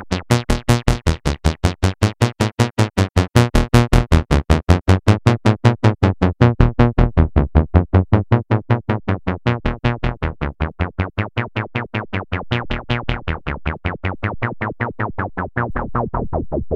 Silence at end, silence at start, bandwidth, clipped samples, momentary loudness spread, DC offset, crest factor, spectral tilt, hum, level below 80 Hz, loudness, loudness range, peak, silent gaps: 0 s; 0 s; 13.5 kHz; under 0.1%; 9 LU; under 0.1%; 16 dB; -6.5 dB/octave; none; -24 dBFS; -19 LUFS; 8 LU; 0 dBFS; none